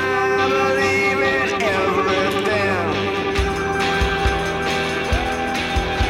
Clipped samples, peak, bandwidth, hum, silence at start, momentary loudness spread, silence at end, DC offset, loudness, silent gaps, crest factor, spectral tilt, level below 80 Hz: under 0.1%; -6 dBFS; 16.5 kHz; none; 0 s; 4 LU; 0 s; under 0.1%; -19 LUFS; none; 12 dB; -4.5 dB/octave; -30 dBFS